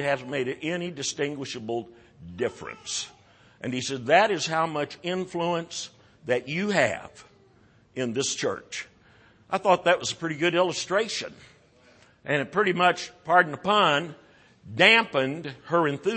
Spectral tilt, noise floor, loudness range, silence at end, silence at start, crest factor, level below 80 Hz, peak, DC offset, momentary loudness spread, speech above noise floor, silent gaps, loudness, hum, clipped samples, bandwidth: -3.5 dB/octave; -59 dBFS; 7 LU; 0 s; 0 s; 24 dB; -66 dBFS; -4 dBFS; under 0.1%; 16 LU; 33 dB; none; -25 LUFS; none; under 0.1%; 8.8 kHz